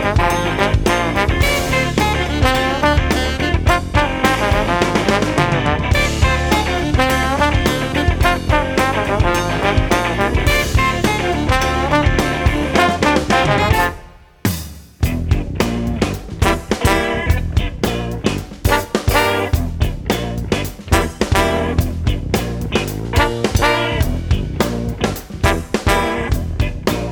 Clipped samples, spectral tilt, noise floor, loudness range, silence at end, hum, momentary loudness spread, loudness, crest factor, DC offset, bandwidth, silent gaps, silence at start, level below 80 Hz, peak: under 0.1%; -5 dB/octave; -38 dBFS; 3 LU; 0 s; none; 6 LU; -17 LUFS; 16 dB; under 0.1%; 20 kHz; none; 0 s; -24 dBFS; 0 dBFS